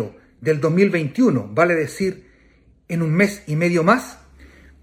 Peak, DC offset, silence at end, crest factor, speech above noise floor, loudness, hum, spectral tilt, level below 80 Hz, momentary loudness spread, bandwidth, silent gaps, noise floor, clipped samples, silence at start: -2 dBFS; under 0.1%; 0.35 s; 18 dB; 36 dB; -19 LUFS; none; -7 dB/octave; -54 dBFS; 9 LU; 16 kHz; none; -54 dBFS; under 0.1%; 0 s